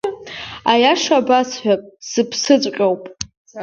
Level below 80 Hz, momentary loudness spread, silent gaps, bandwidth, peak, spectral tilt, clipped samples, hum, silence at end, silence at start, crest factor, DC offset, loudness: -56 dBFS; 16 LU; 3.37-3.45 s; 7.8 kHz; 0 dBFS; -3 dB/octave; under 0.1%; none; 0 s; 0.05 s; 18 dB; under 0.1%; -17 LUFS